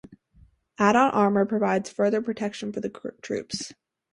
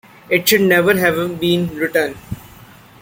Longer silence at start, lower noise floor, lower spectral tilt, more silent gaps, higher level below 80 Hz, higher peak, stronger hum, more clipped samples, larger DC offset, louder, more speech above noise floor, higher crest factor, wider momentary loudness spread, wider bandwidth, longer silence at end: second, 0.1 s vs 0.3 s; first, -58 dBFS vs -42 dBFS; about the same, -5.5 dB/octave vs -4.5 dB/octave; neither; second, -64 dBFS vs -48 dBFS; second, -6 dBFS vs 0 dBFS; neither; neither; neither; second, -25 LUFS vs -15 LUFS; first, 34 dB vs 27 dB; about the same, 20 dB vs 18 dB; second, 14 LU vs 17 LU; second, 11.5 kHz vs 17 kHz; second, 0.4 s vs 0.55 s